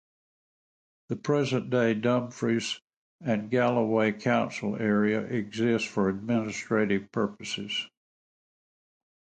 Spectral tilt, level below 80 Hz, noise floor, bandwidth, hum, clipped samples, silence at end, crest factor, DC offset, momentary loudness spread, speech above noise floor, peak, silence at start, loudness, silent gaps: -5.5 dB/octave; -66 dBFS; under -90 dBFS; 9.2 kHz; none; under 0.1%; 1.5 s; 18 dB; under 0.1%; 8 LU; over 63 dB; -12 dBFS; 1.1 s; -28 LUFS; 2.84-2.88 s, 2.97-3.19 s